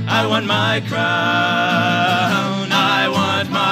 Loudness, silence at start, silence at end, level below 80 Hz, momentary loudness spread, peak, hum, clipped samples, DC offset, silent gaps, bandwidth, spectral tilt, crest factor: -16 LUFS; 0 s; 0 s; -62 dBFS; 3 LU; -2 dBFS; none; under 0.1%; under 0.1%; none; 15.5 kHz; -4.5 dB/octave; 14 dB